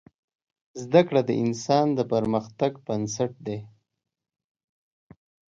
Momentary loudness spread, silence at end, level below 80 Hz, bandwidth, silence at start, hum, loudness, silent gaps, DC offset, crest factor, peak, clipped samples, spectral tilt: 14 LU; 1.9 s; -64 dBFS; 7.8 kHz; 0.75 s; none; -25 LUFS; none; under 0.1%; 22 dB; -4 dBFS; under 0.1%; -6 dB/octave